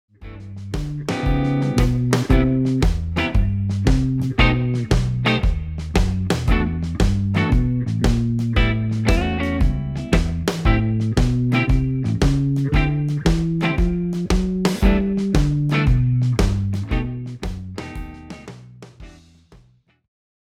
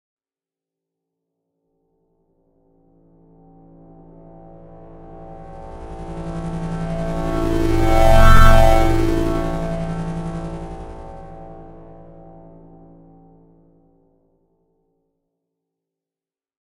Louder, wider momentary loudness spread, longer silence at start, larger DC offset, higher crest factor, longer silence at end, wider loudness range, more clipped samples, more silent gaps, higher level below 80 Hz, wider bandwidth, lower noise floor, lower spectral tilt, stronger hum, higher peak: about the same, -20 LUFS vs -19 LUFS; second, 12 LU vs 29 LU; second, 0.2 s vs 5.1 s; neither; about the same, 18 dB vs 20 dB; second, 1.35 s vs 5.05 s; second, 3 LU vs 24 LU; neither; neither; about the same, -24 dBFS vs -22 dBFS; second, 13.5 kHz vs 15 kHz; second, -55 dBFS vs under -90 dBFS; about the same, -6.5 dB/octave vs -6.5 dB/octave; neither; about the same, -2 dBFS vs 0 dBFS